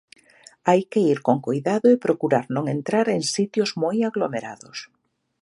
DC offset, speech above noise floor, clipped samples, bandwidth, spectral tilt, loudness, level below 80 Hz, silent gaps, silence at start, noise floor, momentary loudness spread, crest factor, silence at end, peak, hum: under 0.1%; 30 dB; under 0.1%; 11.5 kHz; -5.5 dB/octave; -22 LUFS; -72 dBFS; none; 0.65 s; -52 dBFS; 11 LU; 18 dB; 0.55 s; -4 dBFS; none